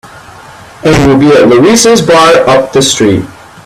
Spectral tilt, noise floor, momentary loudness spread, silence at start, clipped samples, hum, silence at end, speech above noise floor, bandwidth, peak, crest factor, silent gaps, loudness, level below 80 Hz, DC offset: -4.5 dB/octave; -31 dBFS; 7 LU; 0.15 s; 0.5%; none; 0.35 s; 26 dB; 19.5 kHz; 0 dBFS; 6 dB; none; -5 LUFS; -32 dBFS; under 0.1%